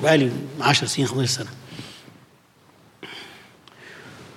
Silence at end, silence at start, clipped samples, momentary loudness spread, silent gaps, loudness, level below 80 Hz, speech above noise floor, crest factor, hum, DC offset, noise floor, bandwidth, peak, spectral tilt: 0.05 s; 0 s; under 0.1%; 23 LU; none; -21 LUFS; -68 dBFS; 34 dB; 20 dB; none; under 0.1%; -55 dBFS; 15.5 kHz; -4 dBFS; -4 dB/octave